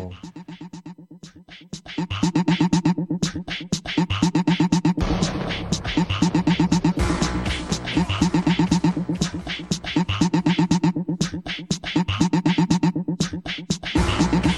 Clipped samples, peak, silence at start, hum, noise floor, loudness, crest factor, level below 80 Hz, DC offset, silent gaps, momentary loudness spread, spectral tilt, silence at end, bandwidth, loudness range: under 0.1%; -6 dBFS; 0 s; none; -44 dBFS; -22 LUFS; 16 dB; -36 dBFS; under 0.1%; none; 11 LU; -5.5 dB/octave; 0 s; 11.5 kHz; 3 LU